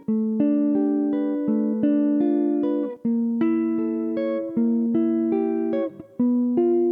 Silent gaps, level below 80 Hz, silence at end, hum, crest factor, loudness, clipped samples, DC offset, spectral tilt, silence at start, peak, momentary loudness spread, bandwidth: none; -72 dBFS; 0 s; none; 12 dB; -23 LUFS; under 0.1%; under 0.1%; -10.5 dB/octave; 0 s; -10 dBFS; 5 LU; 3.7 kHz